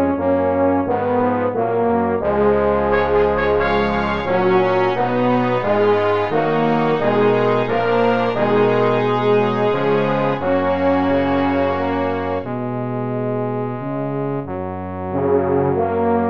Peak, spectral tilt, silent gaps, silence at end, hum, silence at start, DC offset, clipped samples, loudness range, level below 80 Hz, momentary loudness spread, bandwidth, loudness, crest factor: -4 dBFS; -8.5 dB/octave; none; 0 s; none; 0 s; 1%; under 0.1%; 5 LU; -42 dBFS; 7 LU; 6.6 kHz; -18 LUFS; 14 dB